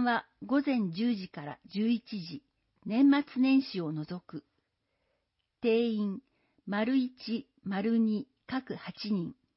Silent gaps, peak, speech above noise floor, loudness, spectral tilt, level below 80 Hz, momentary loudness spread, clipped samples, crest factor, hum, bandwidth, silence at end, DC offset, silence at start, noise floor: none; -16 dBFS; 51 dB; -31 LUFS; -10 dB/octave; -76 dBFS; 16 LU; under 0.1%; 16 dB; none; 5.8 kHz; 0.25 s; under 0.1%; 0 s; -81 dBFS